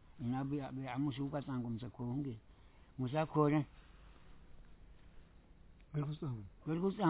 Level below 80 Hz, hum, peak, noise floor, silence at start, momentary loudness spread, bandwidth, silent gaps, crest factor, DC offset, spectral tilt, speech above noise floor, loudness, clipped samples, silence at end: -62 dBFS; none; -20 dBFS; -61 dBFS; 0.05 s; 12 LU; 4 kHz; none; 20 dB; under 0.1%; -7.5 dB/octave; 23 dB; -40 LUFS; under 0.1%; 0 s